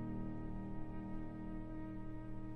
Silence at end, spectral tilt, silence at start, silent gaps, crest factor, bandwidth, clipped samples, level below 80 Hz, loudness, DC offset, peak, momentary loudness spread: 0 s; -10 dB/octave; 0 s; none; 12 dB; 4 kHz; under 0.1%; -50 dBFS; -48 LUFS; under 0.1%; -32 dBFS; 3 LU